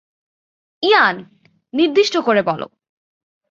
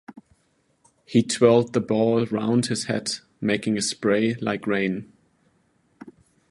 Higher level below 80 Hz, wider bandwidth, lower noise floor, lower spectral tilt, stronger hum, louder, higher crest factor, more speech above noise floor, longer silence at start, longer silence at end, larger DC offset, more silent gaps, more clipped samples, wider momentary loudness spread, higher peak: about the same, -66 dBFS vs -64 dBFS; second, 7.6 kHz vs 11.5 kHz; first, under -90 dBFS vs -67 dBFS; about the same, -4 dB/octave vs -5 dB/octave; neither; first, -16 LUFS vs -23 LUFS; about the same, 18 dB vs 20 dB; first, over 74 dB vs 45 dB; first, 0.8 s vs 0.1 s; first, 0.85 s vs 0.4 s; neither; neither; neither; first, 14 LU vs 9 LU; about the same, -2 dBFS vs -4 dBFS